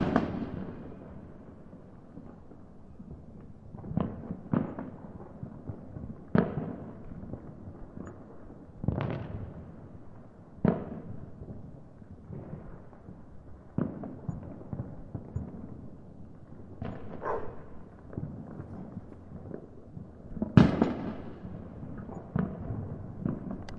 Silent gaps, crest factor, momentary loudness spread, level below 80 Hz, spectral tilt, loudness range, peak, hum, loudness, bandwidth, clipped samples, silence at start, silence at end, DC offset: none; 32 dB; 20 LU; -52 dBFS; -9.5 dB/octave; 12 LU; -2 dBFS; none; -35 LUFS; 7.4 kHz; under 0.1%; 0 s; 0 s; under 0.1%